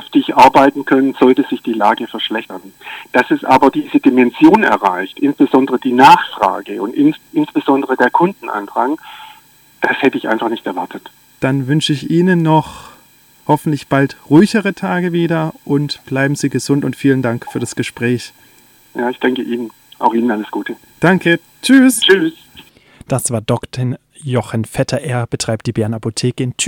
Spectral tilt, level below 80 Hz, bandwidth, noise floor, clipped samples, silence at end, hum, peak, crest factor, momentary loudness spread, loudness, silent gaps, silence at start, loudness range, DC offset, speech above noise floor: -5.5 dB/octave; -52 dBFS; 18 kHz; -47 dBFS; under 0.1%; 0 s; none; 0 dBFS; 14 dB; 13 LU; -14 LUFS; none; 0 s; 7 LU; under 0.1%; 34 dB